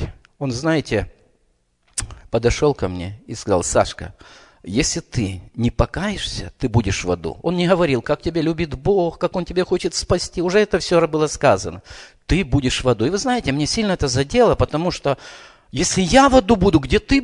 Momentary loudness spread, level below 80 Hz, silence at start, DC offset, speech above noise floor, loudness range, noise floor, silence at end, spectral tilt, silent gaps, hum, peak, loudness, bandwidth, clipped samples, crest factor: 12 LU; -34 dBFS; 0 s; under 0.1%; 45 dB; 5 LU; -63 dBFS; 0 s; -5 dB/octave; none; none; 0 dBFS; -19 LUFS; 11 kHz; under 0.1%; 20 dB